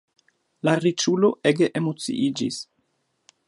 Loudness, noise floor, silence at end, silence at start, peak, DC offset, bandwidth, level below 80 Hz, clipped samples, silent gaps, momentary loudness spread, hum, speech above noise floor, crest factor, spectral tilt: -23 LUFS; -71 dBFS; 0.85 s; 0.65 s; -4 dBFS; under 0.1%; 11.5 kHz; -72 dBFS; under 0.1%; none; 9 LU; none; 50 dB; 20 dB; -5 dB/octave